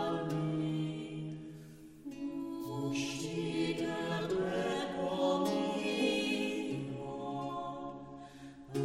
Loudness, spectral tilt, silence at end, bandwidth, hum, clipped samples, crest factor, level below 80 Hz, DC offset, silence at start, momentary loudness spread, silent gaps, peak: -36 LUFS; -5.5 dB/octave; 0 s; 16 kHz; none; under 0.1%; 16 dB; -66 dBFS; under 0.1%; 0 s; 16 LU; none; -20 dBFS